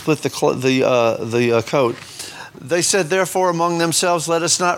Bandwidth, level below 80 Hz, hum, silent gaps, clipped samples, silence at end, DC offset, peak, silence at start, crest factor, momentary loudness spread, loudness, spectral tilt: 18.5 kHz; -62 dBFS; none; none; under 0.1%; 0 s; under 0.1%; -2 dBFS; 0 s; 16 dB; 12 LU; -17 LUFS; -3.5 dB/octave